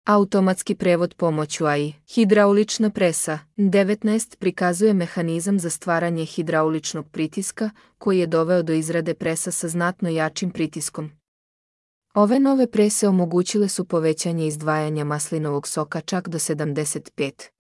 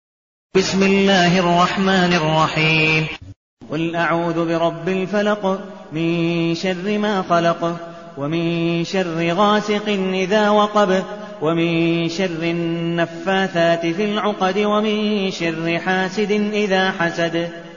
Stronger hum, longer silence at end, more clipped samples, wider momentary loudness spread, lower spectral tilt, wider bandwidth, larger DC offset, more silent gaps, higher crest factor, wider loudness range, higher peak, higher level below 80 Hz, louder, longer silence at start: neither; first, 0.2 s vs 0 s; neither; about the same, 9 LU vs 8 LU; about the same, -5 dB/octave vs -4 dB/octave; first, 12 kHz vs 7.4 kHz; second, under 0.1% vs 0.3%; first, 11.28-12.02 s vs 3.36-3.57 s; about the same, 16 dB vs 14 dB; about the same, 4 LU vs 4 LU; about the same, -4 dBFS vs -4 dBFS; second, -66 dBFS vs -52 dBFS; second, -22 LUFS vs -18 LUFS; second, 0.05 s vs 0.55 s